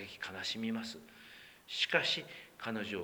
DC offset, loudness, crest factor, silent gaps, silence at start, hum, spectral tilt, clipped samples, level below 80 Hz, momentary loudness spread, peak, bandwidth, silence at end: under 0.1%; -36 LUFS; 26 dB; none; 0 s; none; -3 dB/octave; under 0.1%; -76 dBFS; 22 LU; -12 dBFS; over 20 kHz; 0 s